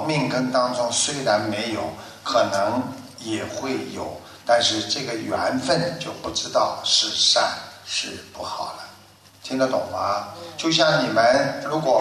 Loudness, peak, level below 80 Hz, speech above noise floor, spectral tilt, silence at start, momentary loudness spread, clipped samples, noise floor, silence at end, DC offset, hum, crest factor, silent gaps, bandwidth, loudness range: -22 LUFS; -4 dBFS; -62 dBFS; 27 dB; -3 dB/octave; 0 s; 15 LU; under 0.1%; -50 dBFS; 0 s; under 0.1%; none; 18 dB; none; 13.5 kHz; 4 LU